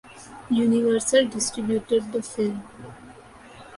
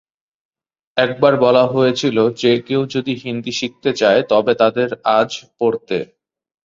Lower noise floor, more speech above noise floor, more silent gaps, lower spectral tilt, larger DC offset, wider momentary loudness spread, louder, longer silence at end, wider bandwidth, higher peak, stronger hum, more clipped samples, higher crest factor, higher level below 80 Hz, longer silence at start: about the same, -46 dBFS vs -43 dBFS; second, 23 dB vs 27 dB; neither; second, -4 dB/octave vs -5.5 dB/octave; neither; first, 23 LU vs 10 LU; second, -23 LUFS vs -16 LUFS; second, 0 s vs 0.6 s; first, 11.5 kHz vs 7.6 kHz; second, -6 dBFS vs -2 dBFS; neither; neither; about the same, 18 dB vs 16 dB; about the same, -58 dBFS vs -60 dBFS; second, 0.1 s vs 0.95 s